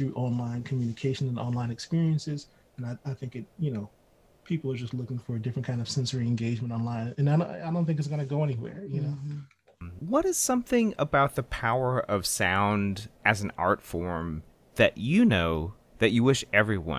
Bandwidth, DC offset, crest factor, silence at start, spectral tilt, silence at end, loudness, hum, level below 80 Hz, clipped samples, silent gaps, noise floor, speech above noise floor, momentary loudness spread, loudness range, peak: 16 kHz; under 0.1%; 22 dB; 0 s; -5.5 dB/octave; 0 s; -28 LUFS; none; -50 dBFS; under 0.1%; none; -60 dBFS; 33 dB; 13 LU; 7 LU; -6 dBFS